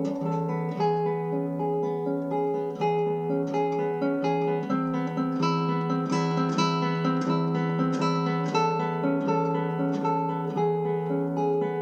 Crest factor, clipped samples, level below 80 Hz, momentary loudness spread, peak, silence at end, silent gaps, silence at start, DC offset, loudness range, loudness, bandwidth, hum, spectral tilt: 14 dB; under 0.1%; -70 dBFS; 3 LU; -12 dBFS; 0 s; none; 0 s; under 0.1%; 2 LU; -27 LUFS; 8.2 kHz; none; -7.5 dB/octave